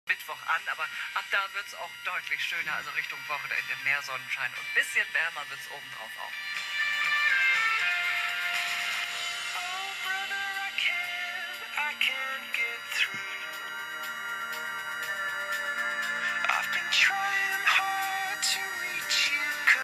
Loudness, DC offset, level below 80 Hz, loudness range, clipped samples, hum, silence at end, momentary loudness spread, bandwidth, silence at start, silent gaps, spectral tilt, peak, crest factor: -28 LUFS; under 0.1%; -76 dBFS; 5 LU; under 0.1%; none; 0 s; 11 LU; 15.5 kHz; 0.05 s; none; 1 dB/octave; -8 dBFS; 22 dB